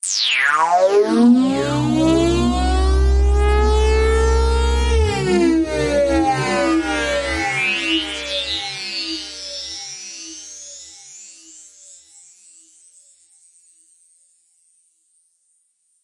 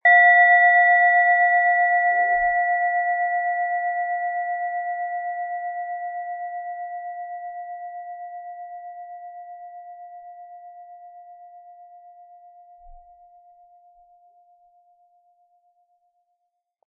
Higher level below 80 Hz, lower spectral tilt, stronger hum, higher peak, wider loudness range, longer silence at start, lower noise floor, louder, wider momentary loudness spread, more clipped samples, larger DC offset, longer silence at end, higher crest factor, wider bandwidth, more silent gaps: first, -24 dBFS vs -62 dBFS; about the same, -5 dB/octave vs -4 dB/octave; neither; about the same, -4 dBFS vs -6 dBFS; second, 17 LU vs 25 LU; about the same, 0.05 s vs 0.05 s; second, -64 dBFS vs -77 dBFS; about the same, -17 LUFS vs -19 LUFS; second, 17 LU vs 26 LU; neither; neither; first, 4.7 s vs 3.9 s; about the same, 14 dB vs 18 dB; first, 11.5 kHz vs 3.8 kHz; neither